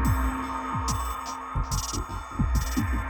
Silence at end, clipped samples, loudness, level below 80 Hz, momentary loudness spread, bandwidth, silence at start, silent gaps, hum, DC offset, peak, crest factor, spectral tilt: 0 s; under 0.1%; -29 LUFS; -30 dBFS; 6 LU; 19.5 kHz; 0 s; none; none; under 0.1%; -14 dBFS; 14 dB; -4.5 dB/octave